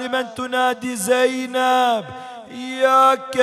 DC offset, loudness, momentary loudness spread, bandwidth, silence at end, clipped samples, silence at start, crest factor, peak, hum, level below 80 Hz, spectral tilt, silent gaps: under 0.1%; -18 LUFS; 18 LU; 14.5 kHz; 0 s; under 0.1%; 0 s; 16 dB; -4 dBFS; none; -66 dBFS; -2.5 dB/octave; none